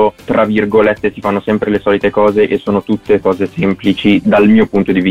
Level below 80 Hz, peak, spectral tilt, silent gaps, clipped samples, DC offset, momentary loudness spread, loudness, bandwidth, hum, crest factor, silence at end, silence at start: -42 dBFS; -2 dBFS; -8 dB/octave; none; under 0.1%; under 0.1%; 6 LU; -12 LUFS; 7.8 kHz; none; 10 dB; 0 s; 0 s